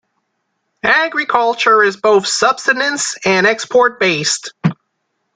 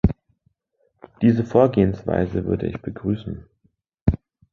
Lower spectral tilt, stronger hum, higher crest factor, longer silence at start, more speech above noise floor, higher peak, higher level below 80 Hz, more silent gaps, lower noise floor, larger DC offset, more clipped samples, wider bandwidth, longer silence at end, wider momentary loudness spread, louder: second, -3 dB/octave vs -10 dB/octave; neither; second, 14 dB vs 20 dB; first, 0.85 s vs 0.05 s; first, 56 dB vs 48 dB; about the same, -2 dBFS vs -2 dBFS; second, -58 dBFS vs -36 dBFS; second, none vs 4.02-4.06 s; about the same, -70 dBFS vs -69 dBFS; neither; neither; first, 9.6 kHz vs 6.8 kHz; first, 0.65 s vs 0.35 s; second, 6 LU vs 16 LU; first, -13 LUFS vs -22 LUFS